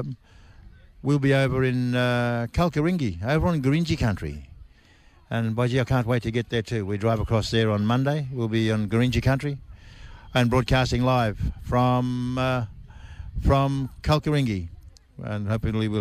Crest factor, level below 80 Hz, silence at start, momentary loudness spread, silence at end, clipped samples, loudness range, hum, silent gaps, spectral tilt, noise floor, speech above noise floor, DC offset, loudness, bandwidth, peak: 14 dB; -38 dBFS; 0 s; 10 LU; 0 s; under 0.1%; 3 LU; none; none; -7 dB/octave; -54 dBFS; 31 dB; under 0.1%; -24 LUFS; 14 kHz; -10 dBFS